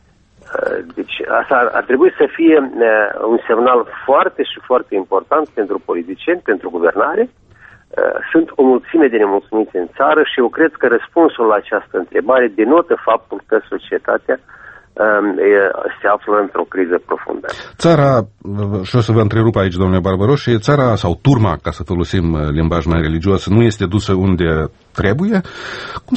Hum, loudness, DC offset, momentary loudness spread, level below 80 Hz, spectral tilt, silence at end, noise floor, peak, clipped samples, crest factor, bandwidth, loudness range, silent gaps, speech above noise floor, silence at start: none; -15 LUFS; under 0.1%; 9 LU; -36 dBFS; -7.5 dB/octave; 0 s; -46 dBFS; 0 dBFS; under 0.1%; 14 dB; 8.4 kHz; 3 LU; none; 31 dB; 0.5 s